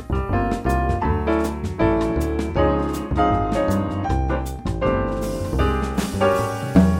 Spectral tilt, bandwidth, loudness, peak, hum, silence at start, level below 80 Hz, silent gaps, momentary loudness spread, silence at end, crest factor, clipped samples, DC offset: -7 dB/octave; 16.5 kHz; -22 LUFS; -2 dBFS; none; 0 s; -28 dBFS; none; 5 LU; 0 s; 18 dB; under 0.1%; under 0.1%